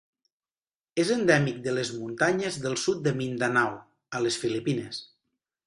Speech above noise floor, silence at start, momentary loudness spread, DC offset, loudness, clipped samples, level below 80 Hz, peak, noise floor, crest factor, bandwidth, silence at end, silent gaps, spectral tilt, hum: over 63 dB; 0.95 s; 11 LU; under 0.1%; -27 LUFS; under 0.1%; -66 dBFS; -8 dBFS; under -90 dBFS; 22 dB; 11.5 kHz; 0.6 s; none; -4.5 dB/octave; none